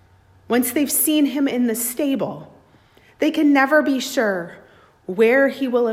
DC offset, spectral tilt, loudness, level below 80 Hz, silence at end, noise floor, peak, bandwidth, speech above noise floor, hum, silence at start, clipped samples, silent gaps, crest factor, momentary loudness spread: under 0.1%; -3 dB/octave; -19 LUFS; -64 dBFS; 0 s; -53 dBFS; -4 dBFS; 16 kHz; 34 dB; none; 0.5 s; under 0.1%; none; 16 dB; 13 LU